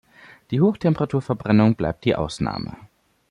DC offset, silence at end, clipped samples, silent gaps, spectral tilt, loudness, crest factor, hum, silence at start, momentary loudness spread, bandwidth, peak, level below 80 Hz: under 0.1%; 0.45 s; under 0.1%; none; -8 dB/octave; -21 LUFS; 16 dB; none; 0.5 s; 10 LU; 11 kHz; -6 dBFS; -48 dBFS